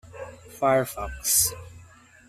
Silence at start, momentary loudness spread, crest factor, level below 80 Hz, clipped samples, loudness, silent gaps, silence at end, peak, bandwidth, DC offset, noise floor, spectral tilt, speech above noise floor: 0.05 s; 21 LU; 22 dB; -46 dBFS; under 0.1%; -23 LUFS; none; 0.45 s; -6 dBFS; 16 kHz; under 0.1%; -51 dBFS; -2.5 dB/octave; 27 dB